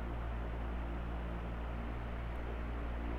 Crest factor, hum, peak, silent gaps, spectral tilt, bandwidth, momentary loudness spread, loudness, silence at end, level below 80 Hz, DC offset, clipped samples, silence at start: 10 dB; none; -30 dBFS; none; -8 dB/octave; 4.7 kHz; 1 LU; -43 LUFS; 0 s; -42 dBFS; under 0.1%; under 0.1%; 0 s